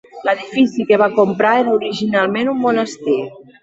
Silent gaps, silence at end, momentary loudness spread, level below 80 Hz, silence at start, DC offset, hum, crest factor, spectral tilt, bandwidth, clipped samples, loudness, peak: none; 0.2 s; 6 LU; -60 dBFS; 0.15 s; under 0.1%; none; 14 dB; -5.5 dB/octave; 8 kHz; under 0.1%; -16 LUFS; -2 dBFS